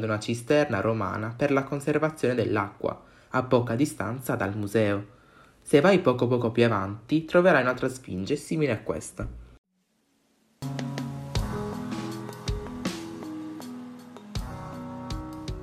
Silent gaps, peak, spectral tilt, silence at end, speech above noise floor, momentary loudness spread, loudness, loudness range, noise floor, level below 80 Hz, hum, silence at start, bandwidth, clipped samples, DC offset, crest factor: 9.58-9.64 s; -6 dBFS; -6.5 dB/octave; 0 s; 46 dB; 17 LU; -27 LUFS; 12 LU; -71 dBFS; -46 dBFS; none; 0 s; 15 kHz; under 0.1%; under 0.1%; 22 dB